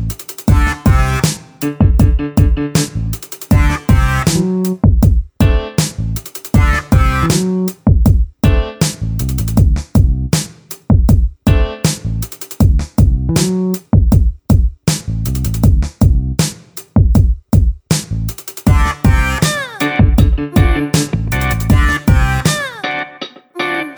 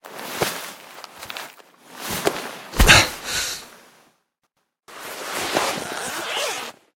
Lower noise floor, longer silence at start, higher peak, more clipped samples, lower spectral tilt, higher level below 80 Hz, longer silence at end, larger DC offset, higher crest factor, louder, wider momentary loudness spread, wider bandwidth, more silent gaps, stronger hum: second, -31 dBFS vs -73 dBFS; about the same, 0 s vs 0.05 s; about the same, 0 dBFS vs 0 dBFS; neither; first, -5.5 dB/octave vs -2 dB/octave; first, -16 dBFS vs -32 dBFS; second, 0 s vs 0.25 s; neither; second, 12 dB vs 24 dB; first, -14 LUFS vs -21 LUFS; second, 8 LU vs 23 LU; first, over 20 kHz vs 17.5 kHz; neither; neither